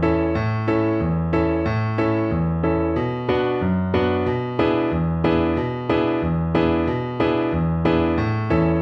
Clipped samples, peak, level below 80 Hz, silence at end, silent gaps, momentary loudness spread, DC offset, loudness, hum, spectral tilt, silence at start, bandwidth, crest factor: under 0.1%; -6 dBFS; -36 dBFS; 0 s; none; 3 LU; under 0.1%; -21 LUFS; none; -9.5 dB/octave; 0 s; 6 kHz; 14 dB